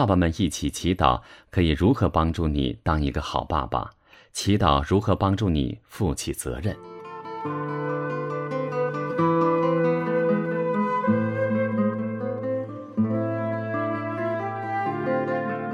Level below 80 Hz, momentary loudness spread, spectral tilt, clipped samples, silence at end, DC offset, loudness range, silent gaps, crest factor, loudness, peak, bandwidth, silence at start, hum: -38 dBFS; 9 LU; -6.5 dB/octave; under 0.1%; 0 s; under 0.1%; 4 LU; none; 20 dB; -25 LUFS; -4 dBFS; 15.5 kHz; 0 s; none